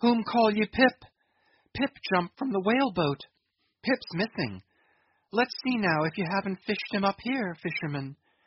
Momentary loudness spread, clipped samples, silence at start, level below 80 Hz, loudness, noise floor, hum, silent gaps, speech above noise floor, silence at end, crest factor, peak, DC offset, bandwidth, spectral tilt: 10 LU; under 0.1%; 0 s; -62 dBFS; -28 LUFS; -76 dBFS; none; none; 49 dB; 0.3 s; 20 dB; -8 dBFS; under 0.1%; 6 kHz; -4 dB/octave